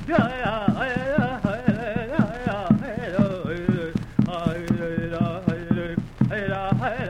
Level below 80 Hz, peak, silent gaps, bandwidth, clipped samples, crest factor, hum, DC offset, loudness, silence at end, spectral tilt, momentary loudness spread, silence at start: -42 dBFS; -4 dBFS; none; 10 kHz; under 0.1%; 20 dB; none; under 0.1%; -25 LUFS; 0 s; -8 dB/octave; 4 LU; 0 s